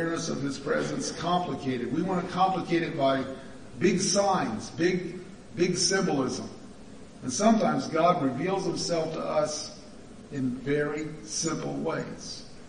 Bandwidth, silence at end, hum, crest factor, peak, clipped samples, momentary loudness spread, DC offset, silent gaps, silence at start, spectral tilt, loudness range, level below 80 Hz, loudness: 10.5 kHz; 0 s; none; 18 dB; -10 dBFS; under 0.1%; 16 LU; 0.3%; none; 0 s; -4.5 dB/octave; 4 LU; -58 dBFS; -28 LUFS